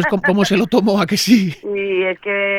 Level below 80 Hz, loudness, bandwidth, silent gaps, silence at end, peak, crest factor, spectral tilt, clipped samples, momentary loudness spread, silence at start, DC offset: -54 dBFS; -16 LUFS; 17 kHz; none; 0 s; 0 dBFS; 16 dB; -5 dB/octave; under 0.1%; 6 LU; 0 s; under 0.1%